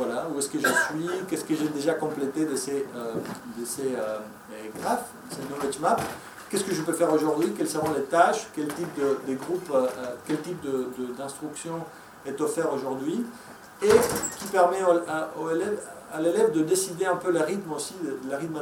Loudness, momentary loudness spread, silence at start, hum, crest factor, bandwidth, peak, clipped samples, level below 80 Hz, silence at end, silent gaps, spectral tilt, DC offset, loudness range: -27 LUFS; 13 LU; 0 s; none; 22 dB; 17.5 kHz; -6 dBFS; under 0.1%; -64 dBFS; 0 s; none; -4 dB/octave; under 0.1%; 6 LU